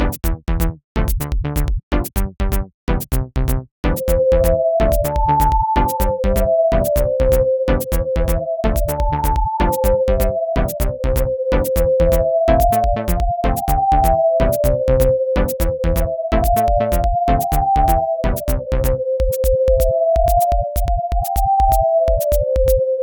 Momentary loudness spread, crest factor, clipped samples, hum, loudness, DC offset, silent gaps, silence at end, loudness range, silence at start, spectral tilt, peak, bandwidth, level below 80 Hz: 7 LU; 14 dB; under 0.1%; none; -18 LUFS; under 0.1%; 0.84-0.95 s, 1.83-1.91 s, 2.74-2.87 s, 3.71-3.83 s; 0 s; 3 LU; 0 s; -6.5 dB/octave; -2 dBFS; 19 kHz; -20 dBFS